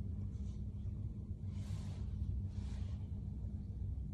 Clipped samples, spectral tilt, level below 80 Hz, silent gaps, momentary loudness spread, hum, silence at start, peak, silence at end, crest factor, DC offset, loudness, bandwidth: under 0.1%; -8.5 dB/octave; -46 dBFS; none; 3 LU; 50 Hz at -50 dBFS; 0 s; -28 dBFS; 0 s; 14 dB; under 0.1%; -45 LUFS; 9.2 kHz